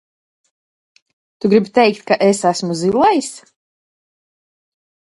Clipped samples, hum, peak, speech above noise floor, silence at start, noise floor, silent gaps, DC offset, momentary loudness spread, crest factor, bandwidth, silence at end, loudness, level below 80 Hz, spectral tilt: under 0.1%; none; 0 dBFS; over 75 dB; 1.45 s; under -90 dBFS; none; under 0.1%; 6 LU; 18 dB; 11.5 kHz; 1.7 s; -15 LUFS; -60 dBFS; -5 dB/octave